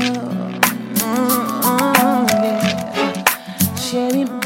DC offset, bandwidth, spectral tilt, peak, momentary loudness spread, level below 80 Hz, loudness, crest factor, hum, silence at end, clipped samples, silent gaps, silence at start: under 0.1%; 16.5 kHz; -4 dB/octave; 0 dBFS; 6 LU; -56 dBFS; -17 LUFS; 18 dB; none; 0 s; under 0.1%; none; 0 s